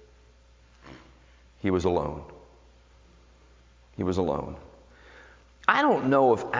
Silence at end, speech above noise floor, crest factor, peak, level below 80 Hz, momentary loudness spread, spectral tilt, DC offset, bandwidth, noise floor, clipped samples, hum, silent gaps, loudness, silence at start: 0 s; 32 dB; 26 dB; -2 dBFS; -50 dBFS; 21 LU; -6.5 dB/octave; under 0.1%; 7.6 kHz; -57 dBFS; under 0.1%; none; none; -25 LUFS; 0.85 s